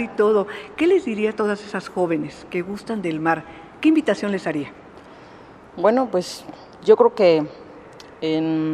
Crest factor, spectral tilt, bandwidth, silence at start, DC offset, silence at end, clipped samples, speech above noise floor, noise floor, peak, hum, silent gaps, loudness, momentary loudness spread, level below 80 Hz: 20 dB; -6 dB/octave; 12 kHz; 0 s; under 0.1%; 0 s; under 0.1%; 24 dB; -44 dBFS; -2 dBFS; none; none; -21 LUFS; 15 LU; -60 dBFS